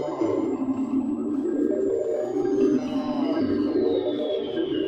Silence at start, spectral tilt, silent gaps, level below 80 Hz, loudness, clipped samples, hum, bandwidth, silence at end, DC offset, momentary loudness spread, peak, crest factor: 0 s; -7 dB/octave; none; -60 dBFS; -25 LUFS; under 0.1%; none; 8.2 kHz; 0 s; under 0.1%; 4 LU; -10 dBFS; 14 dB